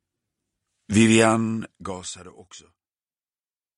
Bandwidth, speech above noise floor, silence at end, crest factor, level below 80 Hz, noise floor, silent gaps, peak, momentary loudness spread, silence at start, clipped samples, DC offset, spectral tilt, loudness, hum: 11.5 kHz; over 68 dB; 1.2 s; 22 dB; -60 dBFS; under -90 dBFS; none; -2 dBFS; 19 LU; 0.9 s; under 0.1%; under 0.1%; -5 dB/octave; -20 LUFS; none